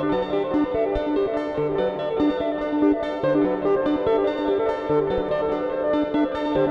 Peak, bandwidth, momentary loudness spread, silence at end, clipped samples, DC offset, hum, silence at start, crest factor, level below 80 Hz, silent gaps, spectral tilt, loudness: -10 dBFS; 6.2 kHz; 3 LU; 0 s; under 0.1%; under 0.1%; none; 0 s; 12 dB; -46 dBFS; none; -8 dB/octave; -23 LUFS